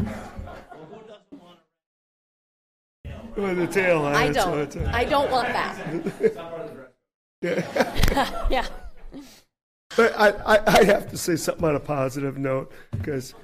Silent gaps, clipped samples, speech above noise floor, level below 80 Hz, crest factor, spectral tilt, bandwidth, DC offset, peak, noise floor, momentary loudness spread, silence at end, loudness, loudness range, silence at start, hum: 1.86-3.04 s, 7.14-7.42 s, 9.63-9.90 s; under 0.1%; 31 dB; -36 dBFS; 18 dB; -5 dB/octave; 15.5 kHz; under 0.1%; -6 dBFS; -53 dBFS; 22 LU; 0 s; -23 LUFS; 7 LU; 0 s; none